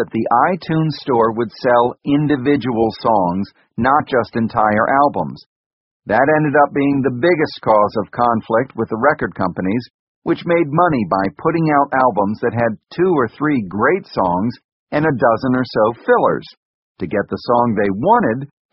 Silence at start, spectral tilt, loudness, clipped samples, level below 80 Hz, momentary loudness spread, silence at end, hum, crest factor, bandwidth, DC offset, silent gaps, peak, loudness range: 0 s; -5.5 dB/octave; -16 LUFS; under 0.1%; -50 dBFS; 7 LU; 0.25 s; none; 16 dB; 6 kHz; under 0.1%; 5.46-6.00 s, 9.94-10.22 s, 14.64-14.87 s, 16.57-16.95 s; 0 dBFS; 2 LU